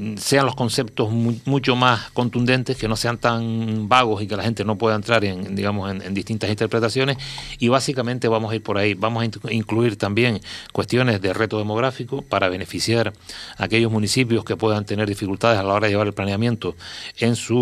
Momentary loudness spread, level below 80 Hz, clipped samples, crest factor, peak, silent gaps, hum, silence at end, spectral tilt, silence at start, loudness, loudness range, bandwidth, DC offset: 8 LU; -50 dBFS; under 0.1%; 20 dB; 0 dBFS; none; none; 0 s; -5.5 dB/octave; 0 s; -21 LUFS; 2 LU; 14.5 kHz; under 0.1%